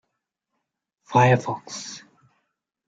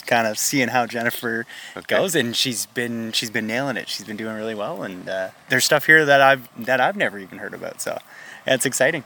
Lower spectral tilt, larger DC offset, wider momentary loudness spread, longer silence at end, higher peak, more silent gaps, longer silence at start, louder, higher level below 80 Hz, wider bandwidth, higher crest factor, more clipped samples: first, -5.5 dB/octave vs -2.5 dB/octave; neither; about the same, 19 LU vs 17 LU; first, 0.9 s vs 0.05 s; second, -6 dBFS vs 0 dBFS; neither; first, 1.1 s vs 0.05 s; about the same, -21 LUFS vs -20 LUFS; first, -64 dBFS vs -70 dBFS; second, 7.8 kHz vs 19 kHz; about the same, 20 dB vs 22 dB; neither